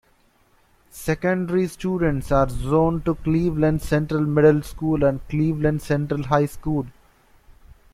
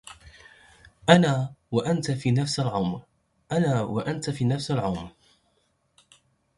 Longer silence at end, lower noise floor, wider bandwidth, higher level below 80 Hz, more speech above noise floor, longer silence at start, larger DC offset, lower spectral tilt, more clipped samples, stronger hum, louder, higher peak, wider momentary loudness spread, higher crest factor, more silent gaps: second, 1.05 s vs 1.5 s; second, -60 dBFS vs -70 dBFS; first, 15 kHz vs 11.5 kHz; first, -38 dBFS vs -56 dBFS; second, 39 dB vs 46 dB; first, 0.95 s vs 0.05 s; neither; first, -8 dB/octave vs -6 dB/octave; neither; neither; first, -22 LUFS vs -25 LUFS; about the same, -4 dBFS vs -2 dBFS; second, 7 LU vs 12 LU; second, 18 dB vs 26 dB; neither